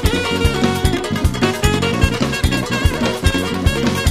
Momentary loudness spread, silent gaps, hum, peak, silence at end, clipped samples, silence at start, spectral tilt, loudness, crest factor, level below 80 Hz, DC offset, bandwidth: 2 LU; none; none; 0 dBFS; 0 s; under 0.1%; 0 s; -5 dB/octave; -17 LUFS; 16 dB; -24 dBFS; under 0.1%; 15 kHz